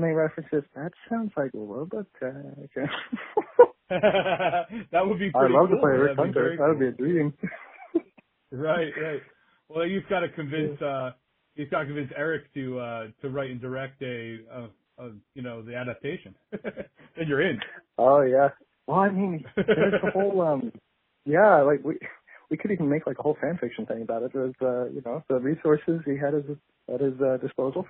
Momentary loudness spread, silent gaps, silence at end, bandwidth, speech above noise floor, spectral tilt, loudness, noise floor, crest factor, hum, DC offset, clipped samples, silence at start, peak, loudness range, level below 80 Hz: 18 LU; none; 0.05 s; 4 kHz; 33 dB; -5.5 dB/octave; -26 LUFS; -59 dBFS; 24 dB; none; under 0.1%; under 0.1%; 0 s; -2 dBFS; 11 LU; -64 dBFS